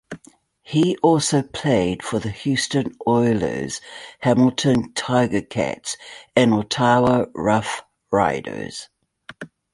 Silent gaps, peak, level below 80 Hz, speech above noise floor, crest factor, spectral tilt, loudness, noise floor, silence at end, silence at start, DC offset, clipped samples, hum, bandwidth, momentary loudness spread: none; -2 dBFS; -50 dBFS; 33 dB; 18 dB; -5 dB/octave; -20 LUFS; -53 dBFS; 0.25 s; 0.1 s; under 0.1%; under 0.1%; none; 11.5 kHz; 15 LU